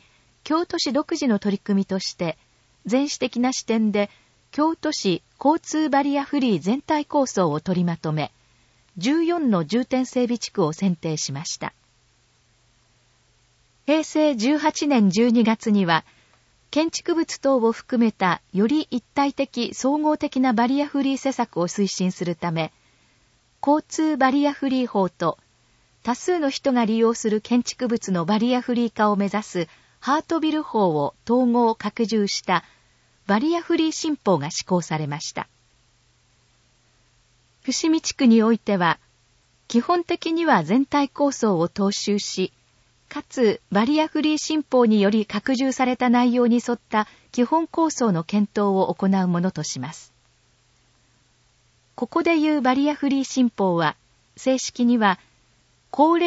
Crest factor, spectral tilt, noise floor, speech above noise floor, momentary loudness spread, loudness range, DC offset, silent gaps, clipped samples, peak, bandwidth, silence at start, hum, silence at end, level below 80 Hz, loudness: 20 dB; -5 dB/octave; -62 dBFS; 40 dB; 8 LU; 5 LU; under 0.1%; none; under 0.1%; -2 dBFS; 8 kHz; 0.45 s; none; 0 s; -64 dBFS; -22 LUFS